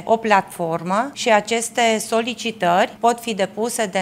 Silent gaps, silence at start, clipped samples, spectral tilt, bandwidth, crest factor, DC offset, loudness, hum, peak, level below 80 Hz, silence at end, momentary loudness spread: none; 0 s; under 0.1%; -3.5 dB/octave; 16 kHz; 20 dB; under 0.1%; -19 LUFS; none; 0 dBFS; -66 dBFS; 0 s; 6 LU